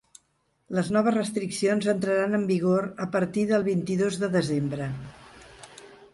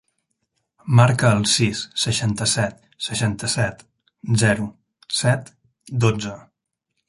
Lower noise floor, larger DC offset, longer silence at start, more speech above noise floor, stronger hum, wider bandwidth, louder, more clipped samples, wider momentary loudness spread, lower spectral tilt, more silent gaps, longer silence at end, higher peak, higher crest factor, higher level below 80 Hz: second, -71 dBFS vs -77 dBFS; neither; second, 0.7 s vs 0.85 s; second, 46 dB vs 57 dB; neither; about the same, 11.5 kHz vs 11.5 kHz; second, -26 LUFS vs -20 LUFS; neither; about the same, 15 LU vs 14 LU; first, -6 dB/octave vs -4.5 dB/octave; neither; second, 0.1 s vs 0.7 s; second, -10 dBFS vs -2 dBFS; about the same, 16 dB vs 20 dB; second, -60 dBFS vs -50 dBFS